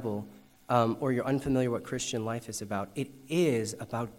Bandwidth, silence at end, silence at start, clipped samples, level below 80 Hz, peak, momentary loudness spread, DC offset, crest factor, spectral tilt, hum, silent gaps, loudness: 16 kHz; 0 s; 0 s; under 0.1%; -60 dBFS; -10 dBFS; 9 LU; under 0.1%; 20 dB; -5.5 dB/octave; none; none; -31 LUFS